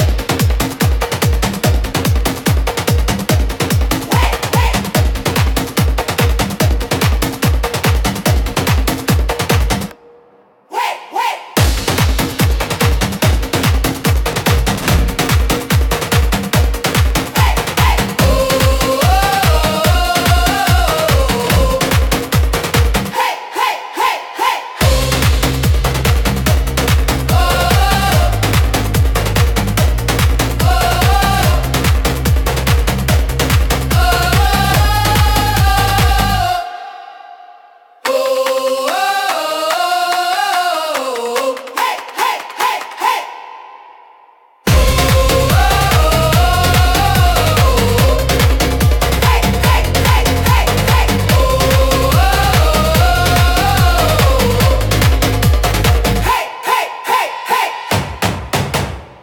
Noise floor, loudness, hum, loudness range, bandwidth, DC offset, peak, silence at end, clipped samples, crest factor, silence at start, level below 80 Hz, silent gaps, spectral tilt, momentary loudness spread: -48 dBFS; -14 LUFS; none; 5 LU; 17.5 kHz; under 0.1%; 0 dBFS; 0.1 s; under 0.1%; 12 dB; 0 s; -18 dBFS; none; -4.5 dB/octave; 5 LU